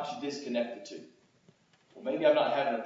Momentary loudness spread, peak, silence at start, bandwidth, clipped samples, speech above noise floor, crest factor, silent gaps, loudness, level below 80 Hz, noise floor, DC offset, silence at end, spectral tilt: 19 LU; -12 dBFS; 0 s; 7.8 kHz; under 0.1%; 34 dB; 20 dB; none; -30 LUFS; -86 dBFS; -65 dBFS; under 0.1%; 0 s; -4.5 dB/octave